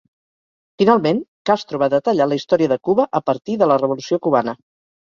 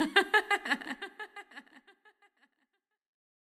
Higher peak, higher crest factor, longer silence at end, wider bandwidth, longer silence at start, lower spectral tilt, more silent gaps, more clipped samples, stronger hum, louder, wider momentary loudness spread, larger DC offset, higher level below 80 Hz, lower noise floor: first, -2 dBFS vs -8 dBFS; second, 16 dB vs 28 dB; second, 0.45 s vs 1.9 s; second, 7.4 kHz vs 15 kHz; first, 0.8 s vs 0 s; first, -6.5 dB/octave vs -1.5 dB/octave; first, 1.28-1.45 s vs none; neither; neither; first, -18 LUFS vs -29 LUFS; second, 5 LU vs 24 LU; neither; first, -62 dBFS vs -78 dBFS; first, under -90 dBFS vs -81 dBFS